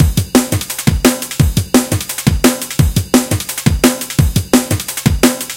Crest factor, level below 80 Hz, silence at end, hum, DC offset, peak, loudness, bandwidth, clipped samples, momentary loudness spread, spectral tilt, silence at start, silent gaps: 14 dB; -24 dBFS; 0 s; none; under 0.1%; 0 dBFS; -14 LUFS; 17.5 kHz; 0.4%; 4 LU; -4.5 dB/octave; 0 s; none